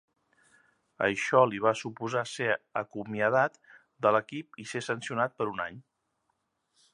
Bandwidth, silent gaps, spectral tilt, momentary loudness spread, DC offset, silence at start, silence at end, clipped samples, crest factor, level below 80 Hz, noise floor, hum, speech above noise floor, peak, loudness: 11.5 kHz; none; -5 dB/octave; 12 LU; under 0.1%; 1 s; 1.15 s; under 0.1%; 22 dB; -72 dBFS; -78 dBFS; none; 49 dB; -8 dBFS; -29 LUFS